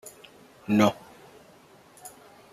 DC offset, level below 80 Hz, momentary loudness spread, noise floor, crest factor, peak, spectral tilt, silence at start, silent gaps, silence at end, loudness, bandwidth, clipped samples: under 0.1%; -68 dBFS; 24 LU; -54 dBFS; 22 dB; -8 dBFS; -5.5 dB/octave; 0.05 s; none; 0.45 s; -24 LUFS; 15 kHz; under 0.1%